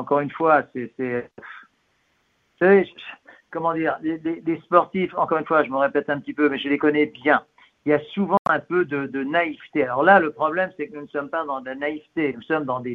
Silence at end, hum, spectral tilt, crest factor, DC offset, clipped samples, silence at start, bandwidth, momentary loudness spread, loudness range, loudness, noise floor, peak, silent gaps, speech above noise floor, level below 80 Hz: 0 s; none; -8.5 dB/octave; 22 dB; under 0.1%; under 0.1%; 0 s; 4.8 kHz; 13 LU; 3 LU; -22 LUFS; -67 dBFS; 0 dBFS; 8.39-8.45 s; 45 dB; -66 dBFS